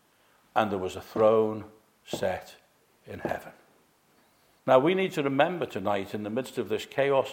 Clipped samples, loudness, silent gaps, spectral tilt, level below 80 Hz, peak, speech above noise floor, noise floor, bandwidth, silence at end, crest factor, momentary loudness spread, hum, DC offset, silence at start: under 0.1%; -28 LUFS; none; -6 dB/octave; -66 dBFS; -8 dBFS; 37 dB; -64 dBFS; 16.5 kHz; 0 s; 22 dB; 15 LU; none; under 0.1%; 0.55 s